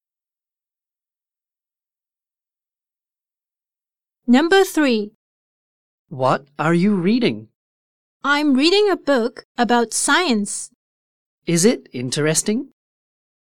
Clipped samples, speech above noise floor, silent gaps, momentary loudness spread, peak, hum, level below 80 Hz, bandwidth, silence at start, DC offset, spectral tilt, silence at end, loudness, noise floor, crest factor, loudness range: under 0.1%; over 72 dB; 5.15-6.05 s, 7.55-8.20 s, 9.45-9.55 s, 10.75-11.42 s; 13 LU; -2 dBFS; none; -62 dBFS; 17.5 kHz; 4.25 s; under 0.1%; -4 dB/octave; 0.9 s; -18 LUFS; under -90 dBFS; 18 dB; 4 LU